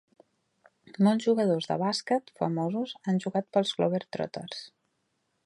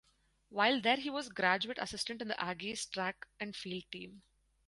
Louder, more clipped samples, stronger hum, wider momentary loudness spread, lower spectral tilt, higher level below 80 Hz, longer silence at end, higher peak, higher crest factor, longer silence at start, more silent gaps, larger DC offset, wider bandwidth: first, -28 LUFS vs -35 LUFS; neither; neither; second, 10 LU vs 13 LU; first, -6 dB/octave vs -3 dB/octave; second, -76 dBFS vs -70 dBFS; first, 0.8 s vs 0.5 s; about the same, -12 dBFS vs -14 dBFS; second, 18 dB vs 24 dB; first, 0.9 s vs 0.5 s; neither; neither; about the same, 11.5 kHz vs 11.5 kHz